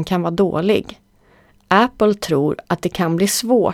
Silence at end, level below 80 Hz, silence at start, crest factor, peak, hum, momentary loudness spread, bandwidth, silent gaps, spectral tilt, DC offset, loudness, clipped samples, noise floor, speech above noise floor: 0 s; -48 dBFS; 0 s; 18 dB; 0 dBFS; none; 5 LU; 17.5 kHz; none; -5 dB/octave; under 0.1%; -18 LUFS; under 0.1%; -53 dBFS; 36 dB